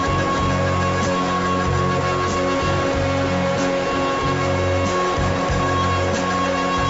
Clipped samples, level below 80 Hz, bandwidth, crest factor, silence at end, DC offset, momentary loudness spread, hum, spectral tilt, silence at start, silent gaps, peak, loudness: under 0.1%; -36 dBFS; 8 kHz; 12 dB; 0 s; under 0.1%; 1 LU; none; -5.5 dB/octave; 0 s; none; -8 dBFS; -20 LUFS